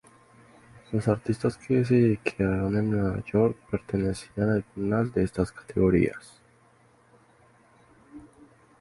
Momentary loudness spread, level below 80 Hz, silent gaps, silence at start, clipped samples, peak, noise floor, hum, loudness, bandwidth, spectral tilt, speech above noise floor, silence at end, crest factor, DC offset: 8 LU; -48 dBFS; none; 0.75 s; under 0.1%; -6 dBFS; -60 dBFS; none; -26 LUFS; 11.5 kHz; -8 dB/octave; 35 dB; 0.55 s; 20 dB; under 0.1%